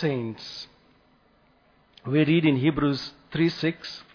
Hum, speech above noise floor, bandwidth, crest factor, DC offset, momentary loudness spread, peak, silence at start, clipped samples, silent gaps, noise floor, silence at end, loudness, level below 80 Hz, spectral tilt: none; 37 dB; 5.4 kHz; 18 dB; under 0.1%; 17 LU; -10 dBFS; 0 s; under 0.1%; none; -62 dBFS; 0.1 s; -25 LUFS; -56 dBFS; -7.5 dB/octave